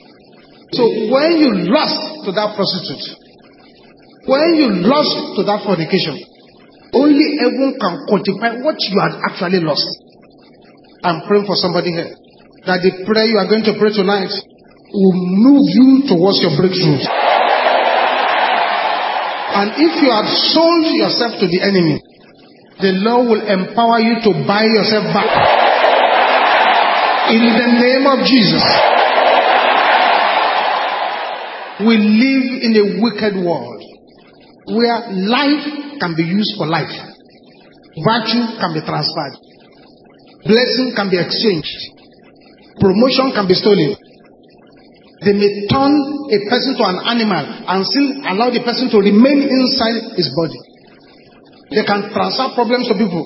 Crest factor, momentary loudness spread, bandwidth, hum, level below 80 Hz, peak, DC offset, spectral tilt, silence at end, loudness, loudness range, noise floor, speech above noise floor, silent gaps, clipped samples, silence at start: 14 dB; 9 LU; 5.8 kHz; none; -54 dBFS; 0 dBFS; under 0.1%; -8.5 dB/octave; 0 s; -14 LUFS; 7 LU; -44 dBFS; 31 dB; none; under 0.1%; 0.7 s